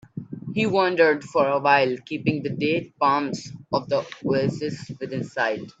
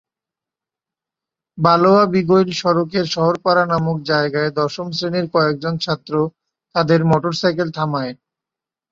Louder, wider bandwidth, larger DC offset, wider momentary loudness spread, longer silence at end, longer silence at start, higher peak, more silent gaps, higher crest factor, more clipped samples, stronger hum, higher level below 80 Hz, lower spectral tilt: second, -23 LUFS vs -17 LUFS; about the same, 8 kHz vs 7.6 kHz; neither; first, 12 LU vs 8 LU; second, 0.1 s vs 0.8 s; second, 0.15 s vs 1.55 s; second, -4 dBFS vs 0 dBFS; neither; about the same, 20 dB vs 18 dB; neither; neither; second, -62 dBFS vs -56 dBFS; about the same, -6 dB/octave vs -6.5 dB/octave